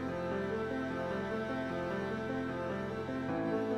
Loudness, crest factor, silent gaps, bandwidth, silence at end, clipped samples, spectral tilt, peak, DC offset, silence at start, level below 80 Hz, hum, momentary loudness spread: -37 LUFS; 12 dB; none; 12.5 kHz; 0 s; under 0.1%; -7 dB/octave; -24 dBFS; under 0.1%; 0 s; -62 dBFS; none; 2 LU